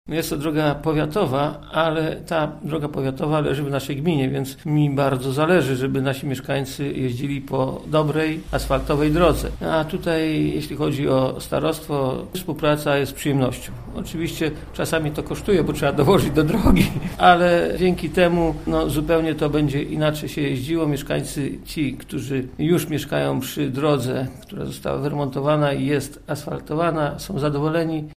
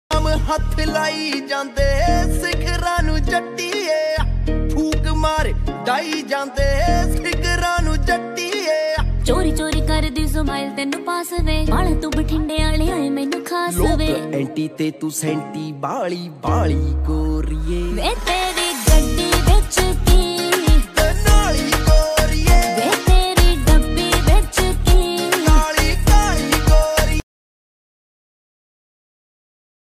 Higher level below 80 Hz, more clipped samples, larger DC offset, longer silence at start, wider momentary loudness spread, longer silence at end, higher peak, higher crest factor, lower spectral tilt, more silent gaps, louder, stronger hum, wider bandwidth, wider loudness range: second, -36 dBFS vs -20 dBFS; neither; neither; about the same, 0.05 s vs 0.1 s; about the same, 9 LU vs 7 LU; second, 0.05 s vs 2.75 s; about the same, 0 dBFS vs -2 dBFS; first, 20 dB vs 14 dB; first, -6 dB/octave vs -4.5 dB/octave; neither; second, -22 LUFS vs -19 LUFS; neither; about the same, 15.5 kHz vs 15.5 kHz; about the same, 5 LU vs 5 LU